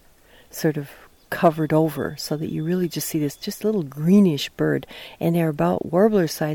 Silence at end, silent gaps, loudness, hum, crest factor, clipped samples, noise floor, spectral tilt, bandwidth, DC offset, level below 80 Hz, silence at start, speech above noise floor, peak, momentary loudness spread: 0 s; none; -22 LUFS; none; 18 dB; under 0.1%; -52 dBFS; -6.5 dB/octave; 18.5 kHz; under 0.1%; -54 dBFS; 0.55 s; 31 dB; -4 dBFS; 10 LU